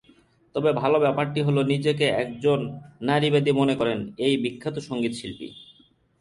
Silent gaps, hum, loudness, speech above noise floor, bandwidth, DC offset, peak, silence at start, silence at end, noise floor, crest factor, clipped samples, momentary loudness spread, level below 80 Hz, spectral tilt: none; none; -24 LUFS; 35 dB; 11.5 kHz; under 0.1%; -8 dBFS; 0.55 s; 0.55 s; -58 dBFS; 16 dB; under 0.1%; 12 LU; -60 dBFS; -6.5 dB/octave